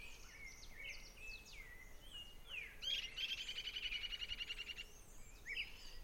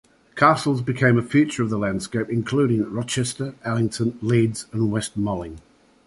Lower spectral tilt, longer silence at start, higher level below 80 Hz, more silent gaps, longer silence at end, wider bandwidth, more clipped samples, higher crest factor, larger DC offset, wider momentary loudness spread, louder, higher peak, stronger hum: second, -0.5 dB/octave vs -6 dB/octave; second, 0 s vs 0.35 s; second, -60 dBFS vs -52 dBFS; neither; second, 0 s vs 0.45 s; first, 16.5 kHz vs 11.5 kHz; neither; about the same, 18 dB vs 20 dB; neither; first, 14 LU vs 9 LU; second, -47 LUFS vs -22 LUFS; second, -32 dBFS vs -2 dBFS; neither